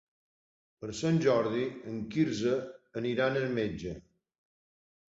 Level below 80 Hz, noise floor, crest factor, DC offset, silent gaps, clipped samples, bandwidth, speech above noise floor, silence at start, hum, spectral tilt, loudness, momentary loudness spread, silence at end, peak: -62 dBFS; under -90 dBFS; 18 dB; under 0.1%; none; under 0.1%; 8 kHz; over 60 dB; 0.8 s; none; -6.5 dB/octave; -31 LUFS; 14 LU; 1.15 s; -14 dBFS